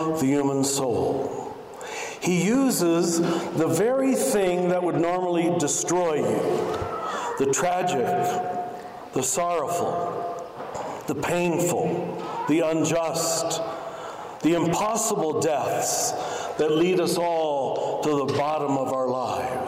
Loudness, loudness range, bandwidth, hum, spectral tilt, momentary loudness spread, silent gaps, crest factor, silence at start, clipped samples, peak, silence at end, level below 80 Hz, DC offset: -24 LUFS; 4 LU; 16 kHz; none; -4.5 dB/octave; 10 LU; none; 12 dB; 0 s; under 0.1%; -12 dBFS; 0 s; -60 dBFS; under 0.1%